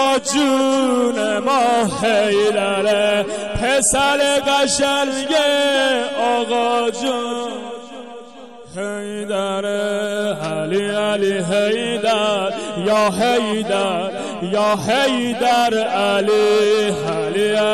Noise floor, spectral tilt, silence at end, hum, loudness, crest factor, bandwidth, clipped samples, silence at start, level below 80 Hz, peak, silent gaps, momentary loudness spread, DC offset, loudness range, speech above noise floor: -39 dBFS; -3 dB/octave; 0 s; none; -17 LUFS; 12 dB; 15 kHz; under 0.1%; 0 s; -48 dBFS; -6 dBFS; none; 9 LU; 0.4%; 7 LU; 21 dB